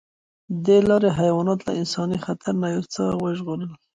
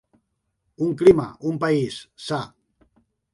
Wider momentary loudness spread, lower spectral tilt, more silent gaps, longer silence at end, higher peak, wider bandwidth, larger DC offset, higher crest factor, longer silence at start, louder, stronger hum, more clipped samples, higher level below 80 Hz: second, 11 LU vs 14 LU; about the same, -6.5 dB/octave vs -7 dB/octave; neither; second, 0.2 s vs 0.85 s; second, -6 dBFS vs -2 dBFS; second, 9.4 kHz vs 11.5 kHz; neither; about the same, 16 dB vs 20 dB; second, 0.5 s vs 0.8 s; about the same, -22 LUFS vs -21 LUFS; neither; neither; about the same, -54 dBFS vs -54 dBFS